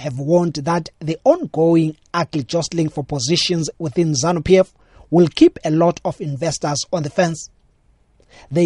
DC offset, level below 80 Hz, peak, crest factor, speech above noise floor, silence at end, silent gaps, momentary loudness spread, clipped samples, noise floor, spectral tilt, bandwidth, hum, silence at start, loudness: under 0.1%; -48 dBFS; 0 dBFS; 18 dB; 39 dB; 0 s; none; 9 LU; under 0.1%; -57 dBFS; -5.5 dB/octave; 11.5 kHz; none; 0 s; -18 LUFS